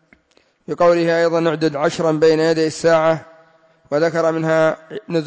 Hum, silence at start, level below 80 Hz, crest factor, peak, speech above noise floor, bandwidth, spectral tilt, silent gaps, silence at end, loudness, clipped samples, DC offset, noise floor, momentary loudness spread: none; 0.7 s; -60 dBFS; 12 dB; -4 dBFS; 42 dB; 8 kHz; -5.5 dB/octave; none; 0 s; -17 LUFS; under 0.1%; under 0.1%; -59 dBFS; 9 LU